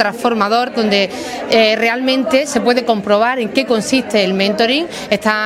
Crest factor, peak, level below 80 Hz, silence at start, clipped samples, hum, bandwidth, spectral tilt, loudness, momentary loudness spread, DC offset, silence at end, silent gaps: 14 dB; 0 dBFS; -54 dBFS; 0 s; under 0.1%; none; 16 kHz; -4 dB/octave; -14 LUFS; 4 LU; under 0.1%; 0 s; none